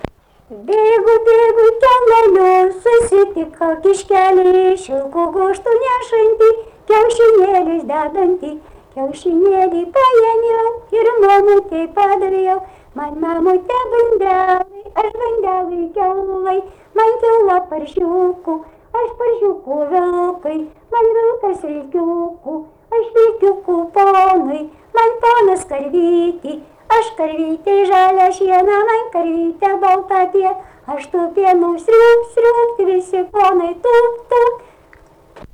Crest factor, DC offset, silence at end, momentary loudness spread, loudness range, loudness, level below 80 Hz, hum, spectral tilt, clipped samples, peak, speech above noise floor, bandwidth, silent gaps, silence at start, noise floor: 10 dB; under 0.1%; 0.15 s; 11 LU; 5 LU; -14 LUFS; -48 dBFS; none; -5 dB/octave; under 0.1%; -4 dBFS; 33 dB; 10.5 kHz; none; 0.05 s; -46 dBFS